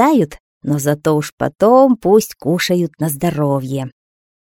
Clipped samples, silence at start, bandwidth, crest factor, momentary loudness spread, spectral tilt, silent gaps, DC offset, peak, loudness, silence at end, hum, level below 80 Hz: under 0.1%; 0 s; 18 kHz; 16 dB; 12 LU; -6 dB/octave; 0.40-0.61 s, 1.32-1.38 s; under 0.1%; 0 dBFS; -16 LUFS; 0.6 s; none; -50 dBFS